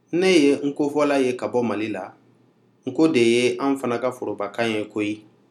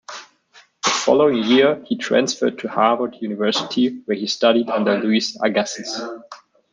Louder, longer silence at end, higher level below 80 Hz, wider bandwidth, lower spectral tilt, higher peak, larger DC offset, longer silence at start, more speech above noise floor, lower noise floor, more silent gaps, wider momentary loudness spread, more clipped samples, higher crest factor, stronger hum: second, -22 LUFS vs -19 LUFS; about the same, 0.3 s vs 0.35 s; second, -78 dBFS vs -66 dBFS; first, 13 kHz vs 9.8 kHz; first, -5 dB/octave vs -3.5 dB/octave; second, -6 dBFS vs -2 dBFS; neither; about the same, 0.1 s vs 0.1 s; first, 38 dB vs 34 dB; first, -59 dBFS vs -52 dBFS; neither; about the same, 12 LU vs 11 LU; neither; about the same, 16 dB vs 18 dB; neither